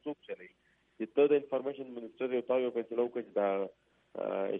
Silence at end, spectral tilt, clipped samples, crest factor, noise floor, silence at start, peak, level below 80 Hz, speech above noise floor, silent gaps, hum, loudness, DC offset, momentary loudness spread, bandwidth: 0 s; -8.5 dB/octave; under 0.1%; 18 dB; -70 dBFS; 0.05 s; -16 dBFS; -84 dBFS; 36 dB; none; none; -33 LUFS; under 0.1%; 16 LU; 3.8 kHz